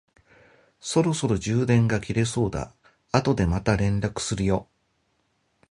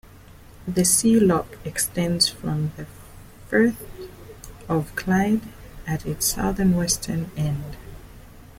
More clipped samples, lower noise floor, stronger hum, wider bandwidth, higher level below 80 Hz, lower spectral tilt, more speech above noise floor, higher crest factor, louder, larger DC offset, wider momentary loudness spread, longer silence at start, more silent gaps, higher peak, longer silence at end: neither; first, -70 dBFS vs -46 dBFS; neither; second, 11.5 kHz vs 16.5 kHz; about the same, -42 dBFS vs -42 dBFS; first, -6 dB/octave vs -4 dB/octave; first, 47 dB vs 24 dB; about the same, 22 dB vs 20 dB; about the same, -24 LUFS vs -22 LUFS; neither; second, 7 LU vs 22 LU; first, 0.85 s vs 0.15 s; neither; about the same, -2 dBFS vs -4 dBFS; first, 1.1 s vs 0.1 s